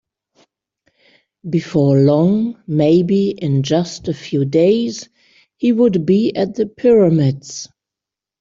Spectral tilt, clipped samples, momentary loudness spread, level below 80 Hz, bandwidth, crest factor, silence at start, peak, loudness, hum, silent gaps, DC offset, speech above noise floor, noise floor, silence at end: -7.5 dB/octave; under 0.1%; 12 LU; -56 dBFS; 7.6 kHz; 14 dB; 1.45 s; -2 dBFS; -16 LUFS; none; none; under 0.1%; 71 dB; -86 dBFS; 0.75 s